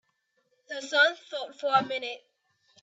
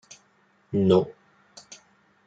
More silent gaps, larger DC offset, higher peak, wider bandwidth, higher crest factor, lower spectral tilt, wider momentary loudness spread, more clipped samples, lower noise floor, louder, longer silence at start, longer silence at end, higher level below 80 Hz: neither; neither; about the same, -10 dBFS vs -8 dBFS; about the same, 8 kHz vs 7.8 kHz; about the same, 22 dB vs 20 dB; second, -2 dB/octave vs -7.5 dB/octave; second, 16 LU vs 25 LU; neither; first, -74 dBFS vs -64 dBFS; second, -27 LUFS vs -23 LUFS; about the same, 0.7 s vs 0.7 s; second, 0.65 s vs 1.15 s; second, -82 dBFS vs -66 dBFS